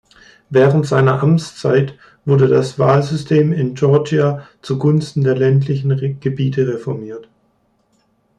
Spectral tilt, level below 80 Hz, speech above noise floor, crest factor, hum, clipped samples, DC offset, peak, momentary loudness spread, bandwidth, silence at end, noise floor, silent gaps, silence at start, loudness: -8 dB/octave; -54 dBFS; 46 dB; 14 dB; none; under 0.1%; under 0.1%; -2 dBFS; 11 LU; 9.8 kHz; 1.15 s; -61 dBFS; none; 0.5 s; -16 LUFS